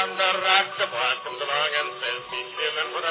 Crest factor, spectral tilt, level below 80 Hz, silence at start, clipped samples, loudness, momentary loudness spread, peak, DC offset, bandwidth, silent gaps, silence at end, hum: 20 dB; 2.5 dB/octave; -76 dBFS; 0 s; under 0.1%; -24 LUFS; 9 LU; -6 dBFS; under 0.1%; 4 kHz; none; 0 s; none